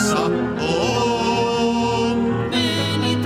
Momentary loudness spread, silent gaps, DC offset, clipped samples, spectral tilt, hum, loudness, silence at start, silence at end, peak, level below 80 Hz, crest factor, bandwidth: 2 LU; none; under 0.1%; under 0.1%; -5 dB/octave; none; -20 LUFS; 0 s; 0 s; -6 dBFS; -44 dBFS; 12 dB; 15.5 kHz